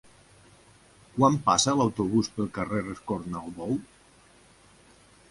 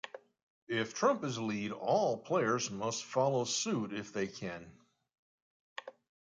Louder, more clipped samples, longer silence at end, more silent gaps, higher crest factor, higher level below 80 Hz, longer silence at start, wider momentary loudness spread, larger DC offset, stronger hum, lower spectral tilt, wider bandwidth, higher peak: first, -27 LUFS vs -34 LUFS; neither; first, 1.45 s vs 0.4 s; second, none vs 0.43-0.67 s, 5.19-5.76 s; about the same, 22 dB vs 18 dB; first, -58 dBFS vs -74 dBFS; first, 1.15 s vs 0.05 s; second, 12 LU vs 17 LU; neither; neither; about the same, -4.5 dB/octave vs -4 dB/octave; first, 11.5 kHz vs 9.6 kHz; first, -8 dBFS vs -18 dBFS